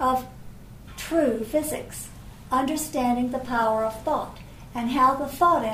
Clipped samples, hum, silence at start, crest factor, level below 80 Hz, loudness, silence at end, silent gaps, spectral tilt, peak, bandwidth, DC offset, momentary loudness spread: under 0.1%; none; 0 s; 16 dB; -46 dBFS; -25 LUFS; 0 s; none; -4.5 dB/octave; -10 dBFS; 16 kHz; under 0.1%; 19 LU